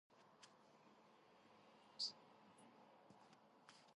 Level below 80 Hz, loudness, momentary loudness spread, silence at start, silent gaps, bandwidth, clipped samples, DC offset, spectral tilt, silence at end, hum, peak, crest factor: under -90 dBFS; -49 LUFS; 21 LU; 0.1 s; none; 11 kHz; under 0.1%; under 0.1%; -1.5 dB/octave; 0 s; none; -34 dBFS; 26 dB